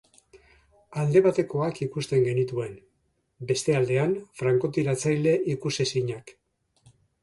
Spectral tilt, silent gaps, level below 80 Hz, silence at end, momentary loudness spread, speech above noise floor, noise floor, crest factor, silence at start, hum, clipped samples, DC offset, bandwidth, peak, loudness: -6 dB/octave; none; -62 dBFS; 0.9 s; 11 LU; 47 dB; -72 dBFS; 20 dB; 0.9 s; none; under 0.1%; under 0.1%; 11.5 kHz; -8 dBFS; -25 LUFS